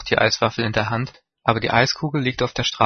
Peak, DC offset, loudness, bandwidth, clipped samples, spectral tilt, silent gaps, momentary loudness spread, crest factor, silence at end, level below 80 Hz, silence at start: 0 dBFS; under 0.1%; -20 LUFS; 6.6 kHz; under 0.1%; -4.5 dB/octave; none; 7 LU; 20 dB; 0 s; -48 dBFS; 0 s